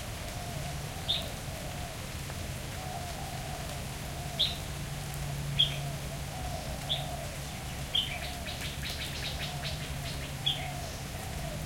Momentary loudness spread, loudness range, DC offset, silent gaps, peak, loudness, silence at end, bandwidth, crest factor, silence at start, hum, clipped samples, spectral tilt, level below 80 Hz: 9 LU; 4 LU; under 0.1%; none; -14 dBFS; -35 LUFS; 0 s; 17 kHz; 22 dB; 0 s; none; under 0.1%; -3.5 dB/octave; -44 dBFS